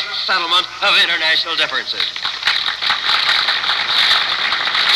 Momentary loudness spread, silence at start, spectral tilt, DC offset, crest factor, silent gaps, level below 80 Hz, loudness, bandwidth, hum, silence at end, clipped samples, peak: 6 LU; 0 s; 0 dB/octave; under 0.1%; 14 dB; none; -58 dBFS; -14 LUFS; 13 kHz; none; 0 s; under 0.1%; -4 dBFS